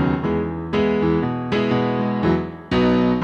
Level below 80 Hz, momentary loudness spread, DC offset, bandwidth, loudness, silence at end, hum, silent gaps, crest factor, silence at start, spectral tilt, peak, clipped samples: -40 dBFS; 6 LU; under 0.1%; 7 kHz; -20 LUFS; 0 s; none; none; 12 dB; 0 s; -8.5 dB/octave; -6 dBFS; under 0.1%